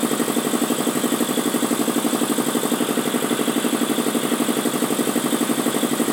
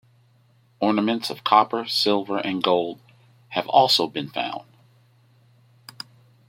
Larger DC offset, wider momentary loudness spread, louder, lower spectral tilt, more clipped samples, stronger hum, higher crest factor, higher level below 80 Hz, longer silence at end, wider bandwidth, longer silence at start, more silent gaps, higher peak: neither; second, 1 LU vs 20 LU; about the same, -21 LUFS vs -22 LUFS; about the same, -3 dB/octave vs -4 dB/octave; neither; neither; second, 14 dB vs 22 dB; about the same, -72 dBFS vs -72 dBFS; second, 0 s vs 1.85 s; about the same, 17 kHz vs 16.5 kHz; second, 0 s vs 0.8 s; neither; second, -6 dBFS vs -2 dBFS